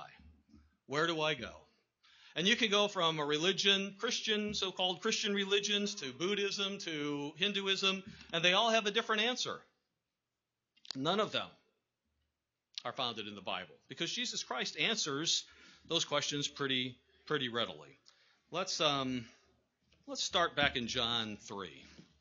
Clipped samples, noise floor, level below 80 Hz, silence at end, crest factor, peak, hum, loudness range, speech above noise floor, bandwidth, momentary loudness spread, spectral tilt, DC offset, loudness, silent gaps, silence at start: under 0.1%; -90 dBFS; -70 dBFS; 0.2 s; 24 dB; -12 dBFS; none; 8 LU; 55 dB; 7.4 kHz; 13 LU; -1 dB/octave; under 0.1%; -34 LUFS; none; 0 s